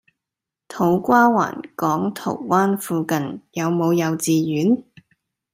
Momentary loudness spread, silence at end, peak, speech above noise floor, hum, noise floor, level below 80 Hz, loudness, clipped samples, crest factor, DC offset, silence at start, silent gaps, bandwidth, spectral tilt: 10 LU; 0.7 s; -2 dBFS; 67 dB; none; -86 dBFS; -64 dBFS; -20 LUFS; under 0.1%; 18 dB; under 0.1%; 0.7 s; none; 16 kHz; -6 dB/octave